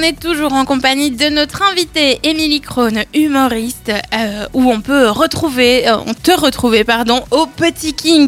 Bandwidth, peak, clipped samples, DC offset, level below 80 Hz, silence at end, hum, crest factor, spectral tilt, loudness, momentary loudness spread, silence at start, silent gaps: 16.5 kHz; -2 dBFS; under 0.1%; under 0.1%; -38 dBFS; 0 s; none; 12 dB; -3.5 dB/octave; -13 LUFS; 5 LU; 0 s; none